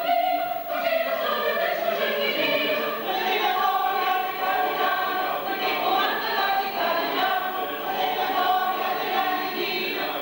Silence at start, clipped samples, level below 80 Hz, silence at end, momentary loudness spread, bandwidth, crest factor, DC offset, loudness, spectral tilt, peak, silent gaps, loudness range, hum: 0 s; under 0.1%; -66 dBFS; 0 s; 4 LU; 16.5 kHz; 12 dB; under 0.1%; -24 LUFS; -3 dB/octave; -12 dBFS; none; 1 LU; none